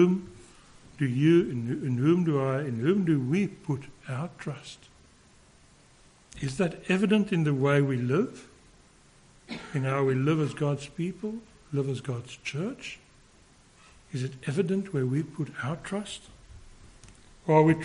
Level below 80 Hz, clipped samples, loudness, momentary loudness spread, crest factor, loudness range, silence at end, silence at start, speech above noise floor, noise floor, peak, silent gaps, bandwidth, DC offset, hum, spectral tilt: -60 dBFS; under 0.1%; -28 LUFS; 15 LU; 20 dB; 9 LU; 0 s; 0 s; 31 dB; -58 dBFS; -8 dBFS; none; 10.5 kHz; under 0.1%; none; -7.5 dB/octave